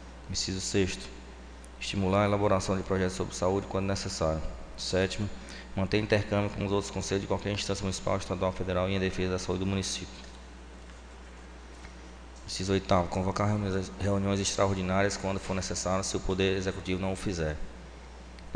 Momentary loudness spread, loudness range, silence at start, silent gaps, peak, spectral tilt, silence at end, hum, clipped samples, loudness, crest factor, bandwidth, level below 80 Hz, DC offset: 20 LU; 5 LU; 0 s; none; -10 dBFS; -5 dB/octave; 0 s; none; under 0.1%; -30 LUFS; 20 dB; 10 kHz; -46 dBFS; under 0.1%